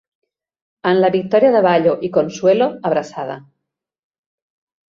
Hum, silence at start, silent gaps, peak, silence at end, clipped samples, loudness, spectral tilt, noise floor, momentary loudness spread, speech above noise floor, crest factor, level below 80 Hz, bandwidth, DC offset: none; 0.85 s; none; -2 dBFS; 1.5 s; under 0.1%; -16 LUFS; -6.5 dB/octave; -80 dBFS; 14 LU; 65 dB; 16 dB; -62 dBFS; 7.4 kHz; under 0.1%